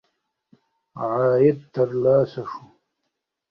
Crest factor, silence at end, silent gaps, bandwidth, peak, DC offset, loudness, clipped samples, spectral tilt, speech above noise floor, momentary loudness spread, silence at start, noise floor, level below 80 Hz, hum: 18 dB; 0.9 s; none; 6 kHz; -6 dBFS; under 0.1%; -21 LUFS; under 0.1%; -10 dB/octave; 59 dB; 16 LU; 0.95 s; -79 dBFS; -62 dBFS; none